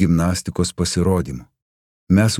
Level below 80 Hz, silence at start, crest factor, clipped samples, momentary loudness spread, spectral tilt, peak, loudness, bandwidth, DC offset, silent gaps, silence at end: -42 dBFS; 0 s; 16 dB; under 0.1%; 10 LU; -5.5 dB/octave; -2 dBFS; -20 LUFS; 15 kHz; under 0.1%; 1.62-2.07 s; 0 s